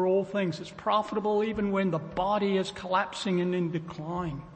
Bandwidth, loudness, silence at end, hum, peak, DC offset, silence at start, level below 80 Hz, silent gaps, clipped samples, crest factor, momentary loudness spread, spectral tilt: 8.8 kHz; -29 LUFS; 0 s; none; -12 dBFS; under 0.1%; 0 s; -56 dBFS; none; under 0.1%; 16 dB; 7 LU; -6.5 dB/octave